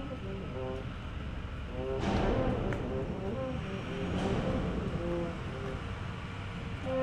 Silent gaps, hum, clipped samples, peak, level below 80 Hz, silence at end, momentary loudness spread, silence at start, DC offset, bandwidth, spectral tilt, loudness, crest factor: none; none; under 0.1%; -18 dBFS; -42 dBFS; 0 s; 9 LU; 0 s; under 0.1%; 11 kHz; -7.5 dB/octave; -36 LUFS; 18 dB